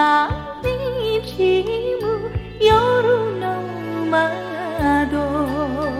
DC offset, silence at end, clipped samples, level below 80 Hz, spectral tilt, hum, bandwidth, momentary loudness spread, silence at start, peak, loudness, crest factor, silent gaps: under 0.1%; 0 s; under 0.1%; -38 dBFS; -6.5 dB/octave; none; 15 kHz; 9 LU; 0 s; -2 dBFS; -20 LUFS; 16 dB; none